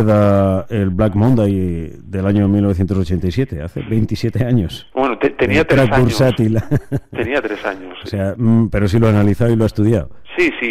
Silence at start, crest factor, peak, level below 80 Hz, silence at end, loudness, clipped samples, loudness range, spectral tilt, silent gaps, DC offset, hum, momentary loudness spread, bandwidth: 0 s; 12 dB; -4 dBFS; -34 dBFS; 0 s; -16 LUFS; under 0.1%; 2 LU; -8 dB/octave; none; under 0.1%; none; 10 LU; 14 kHz